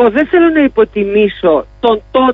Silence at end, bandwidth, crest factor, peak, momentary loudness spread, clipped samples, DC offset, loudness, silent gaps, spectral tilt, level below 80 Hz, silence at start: 0 s; 5 kHz; 10 dB; 0 dBFS; 4 LU; under 0.1%; under 0.1%; -11 LUFS; none; -8 dB/octave; -40 dBFS; 0 s